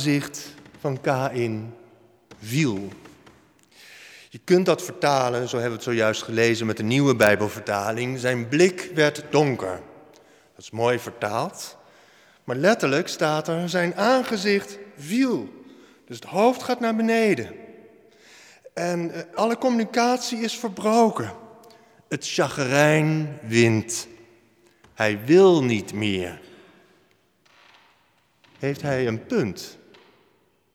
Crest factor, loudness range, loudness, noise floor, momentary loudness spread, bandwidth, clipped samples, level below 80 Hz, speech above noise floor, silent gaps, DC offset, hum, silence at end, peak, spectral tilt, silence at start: 22 dB; 8 LU; -23 LUFS; -64 dBFS; 18 LU; 18.5 kHz; under 0.1%; -66 dBFS; 41 dB; none; under 0.1%; none; 1 s; -2 dBFS; -5 dB/octave; 0 s